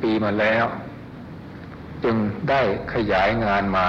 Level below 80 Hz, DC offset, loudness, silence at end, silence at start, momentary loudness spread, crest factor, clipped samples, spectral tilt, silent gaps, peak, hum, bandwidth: -44 dBFS; under 0.1%; -21 LUFS; 0 s; 0 s; 18 LU; 12 dB; under 0.1%; -7.5 dB/octave; none; -10 dBFS; none; 7.4 kHz